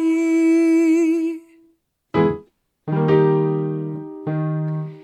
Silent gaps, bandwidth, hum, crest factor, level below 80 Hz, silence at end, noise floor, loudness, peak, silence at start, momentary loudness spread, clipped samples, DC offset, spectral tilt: none; 10.5 kHz; none; 16 dB; -58 dBFS; 0 s; -61 dBFS; -19 LUFS; -4 dBFS; 0 s; 14 LU; under 0.1%; under 0.1%; -8.5 dB/octave